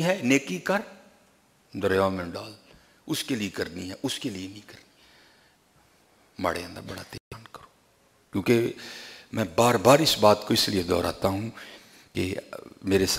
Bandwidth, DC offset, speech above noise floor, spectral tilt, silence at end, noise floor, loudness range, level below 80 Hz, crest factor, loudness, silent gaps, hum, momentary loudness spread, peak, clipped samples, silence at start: 16 kHz; under 0.1%; 37 dB; -4.5 dB/octave; 0 s; -63 dBFS; 14 LU; -58 dBFS; 24 dB; -25 LUFS; 7.20-7.31 s; none; 21 LU; -2 dBFS; under 0.1%; 0 s